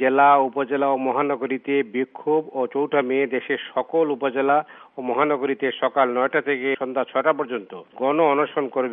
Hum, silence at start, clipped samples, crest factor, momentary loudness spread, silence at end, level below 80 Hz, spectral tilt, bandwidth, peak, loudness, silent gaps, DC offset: none; 0 s; under 0.1%; 16 dB; 7 LU; 0 s; -78 dBFS; -3 dB/octave; 3.8 kHz; -4 dBFS; -22 LUFS; none; under 0.1%